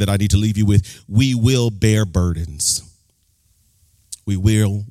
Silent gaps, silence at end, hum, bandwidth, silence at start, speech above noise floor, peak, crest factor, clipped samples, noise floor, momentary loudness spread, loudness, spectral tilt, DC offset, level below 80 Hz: none; 0 s; none; 15 kHz; 0 s; 44 dB; -2 dBFS; 16 dB; under 0.1%; -61 dBFS; 7 LU; -18 LUFS; -5.5 dB/octave; under 0.1%; -36 dBFS